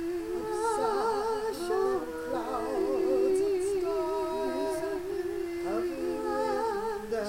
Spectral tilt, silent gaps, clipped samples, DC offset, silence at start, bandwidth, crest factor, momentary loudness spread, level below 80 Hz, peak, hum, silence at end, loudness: -4.5 dB/octave; none; under 0.1%; under 0.1%; 0 s; 16.5 kHz; 14 dB; 6 LU; -56 dBFS; -16 dBFS; none; 0 s; -31 LUFS